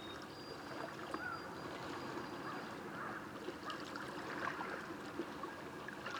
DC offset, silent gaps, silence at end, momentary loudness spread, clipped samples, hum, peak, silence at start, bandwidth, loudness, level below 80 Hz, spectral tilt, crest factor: under 0.1%; none; 0 s; 5 LU; under 0.1%; none; -26 dBFS; 0 s; over 20 kHz; -46 LUFS; -74 dBFS; -4.5 dB/octave; 20 dB